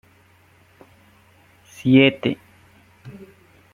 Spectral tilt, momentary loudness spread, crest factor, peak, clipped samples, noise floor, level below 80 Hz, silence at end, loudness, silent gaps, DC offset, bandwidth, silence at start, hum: -7 dB/octave; 28 LU; 22 dB; -2 dBFS; under 0.1%; -55 dBFS; -60 dBFS; 0.6 s; -18 LUFS; none; under 0.1%; 10.5 kHz; 1.85 s; none